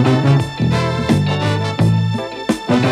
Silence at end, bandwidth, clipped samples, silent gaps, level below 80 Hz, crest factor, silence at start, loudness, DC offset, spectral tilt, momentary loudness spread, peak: 0 s; 12.5 kHz; under 0.1%; none; -40 dBFS; 14 dB; 0 s; -16 LUFS; under 0.1%; -7 dB/octave; 6 LU; -2 dBFS